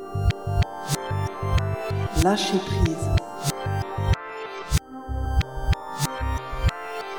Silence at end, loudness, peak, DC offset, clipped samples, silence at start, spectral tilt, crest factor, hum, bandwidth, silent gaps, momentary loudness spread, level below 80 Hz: 0 s; -26 LUFS; -8 dBFS; 0.4%; under 0.1%; 0 s; -5.5 dB/octave; 18 dB; none; over 20 kHz; none; 6 LU; -30 dBFS